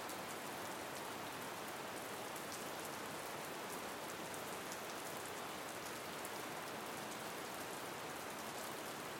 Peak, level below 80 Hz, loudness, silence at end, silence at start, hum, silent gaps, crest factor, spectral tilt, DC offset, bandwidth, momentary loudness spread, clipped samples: -26 dBFS; -78 dBFS; -46 LUFS; 0 s; 0 s; none; none; 20 dB; -2.5 dB/octave; under 0.1%; 17 kHz; 1 LU; under 0.1%